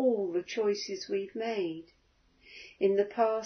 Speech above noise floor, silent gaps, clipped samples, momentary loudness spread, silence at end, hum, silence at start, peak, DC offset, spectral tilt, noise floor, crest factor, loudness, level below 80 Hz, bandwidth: 33 dB; none; under 0.1%; 19 LU; 0 s; none; 0 s; -14 dBFS; under 0.1%; -4.5 dB/octave; -64 dBFS; 18 dB; -32 LUFS; -74 dBFS; 6.6 kHz